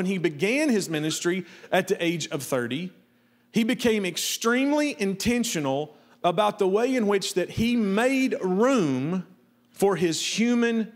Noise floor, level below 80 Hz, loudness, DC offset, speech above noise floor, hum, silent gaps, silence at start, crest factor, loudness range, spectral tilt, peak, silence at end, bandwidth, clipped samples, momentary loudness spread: -62 dBFS; -60 dBFS; -25 LUFS; under 0.1%; 38 dB; none; none; 0 s; 18 dB; 3 LU; -4.5 dB/octave; -8 dBFS; 0.05 s; 16 kHz; under 0.1%; 6 LU